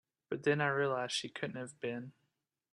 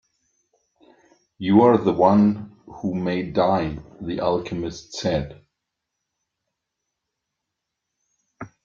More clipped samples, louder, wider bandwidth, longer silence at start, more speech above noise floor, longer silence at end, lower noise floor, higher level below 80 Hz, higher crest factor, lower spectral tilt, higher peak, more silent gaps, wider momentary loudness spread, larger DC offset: neither; second, -36 LUFS vs -21 LUFS; first, 11.5 kHz vs 7.4 kHz; second, 0.3 s vs 1.4 s; second, 48 dB vs 62 dB; first, 0.65 s vs 0.15 s; about the same, -84 dBFS vs -82 dBFS; second, -80 dBFS vs -52 dBFS; about the same, 20 dB vs 22 dB; second, -4.5 dB/octave vs -7 dB/octave; second, -18 dBFS vs -2 dBFS; neither; second, 12 LU vs 17 LU; neither